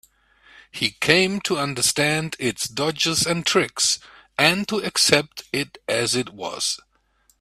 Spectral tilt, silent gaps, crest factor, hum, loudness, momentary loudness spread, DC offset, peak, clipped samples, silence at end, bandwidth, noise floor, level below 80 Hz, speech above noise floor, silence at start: -2.5 dB/octave; none; 24 dB; none; -21 LUFS; 10 LU; under 0.1%; 0 dBFS; under 0.1%; 0.65 s; 16 kHz; -63 dBFS; -58 dBFS; 41 dB; 0.75 s